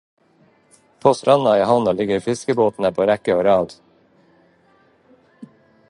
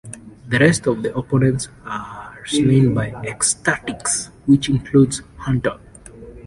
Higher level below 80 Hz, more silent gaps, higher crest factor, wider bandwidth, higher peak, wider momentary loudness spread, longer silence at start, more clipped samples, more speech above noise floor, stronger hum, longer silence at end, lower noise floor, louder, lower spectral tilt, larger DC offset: second, -56 dBFS vs -44 dBFS; neither; about the same, 20 dB vs 16 dB; about the same, 11.5 kHz vs 11.5 kHz; about the same, 0 dBFS vs -2 dBFS; second, 6 LU vs 14 LU; first, 1.05 s vs 0.05 s; neither; first, 40 dB vs 22 dB; neither; first, 0.45 s vs 0.05 s; first, -57 dBFS vs -40 dBFS; about the same, -18 LUFS vs -18 LUFS; about the same, -6 dB/octave vs -5 dB/octave; neither